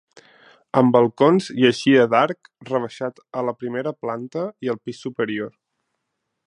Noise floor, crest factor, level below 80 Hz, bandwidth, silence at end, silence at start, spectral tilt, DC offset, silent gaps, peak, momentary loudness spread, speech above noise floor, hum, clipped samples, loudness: -78 dBFS; 20 dB; -68 dBFS; 10.5 kHz; 1 s; 0.75 s; -6 dB/octave; under 0.1%; none; -2 dBFS; 13 LU; 58 dB; none; under 0.1%; -21 LUFS